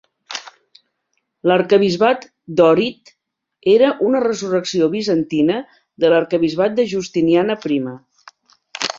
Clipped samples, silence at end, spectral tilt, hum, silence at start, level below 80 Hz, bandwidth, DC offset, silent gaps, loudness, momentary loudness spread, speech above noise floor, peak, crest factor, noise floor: under 0.1%; 0 s; -5.5 dB/octave; none; 0.3 s; -60 dBFS; 7.8 kHz; under 0.1%; none; -17 LUFS; 11 LU; 56 dB; -2 dBFS; 16 dB; -71 dBFS